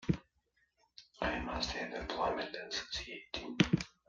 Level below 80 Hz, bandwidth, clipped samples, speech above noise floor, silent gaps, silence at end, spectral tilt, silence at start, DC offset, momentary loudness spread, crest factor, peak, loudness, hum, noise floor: -54 dBFS; 9.4 kHz; under 0.1%; 38 dB; none; 0.2 s; -5 dB/octave; 0 s; under 0.1%; 11 LU; 28 dB; -10 dBFS; -37 LUFS; none; -77 dBFS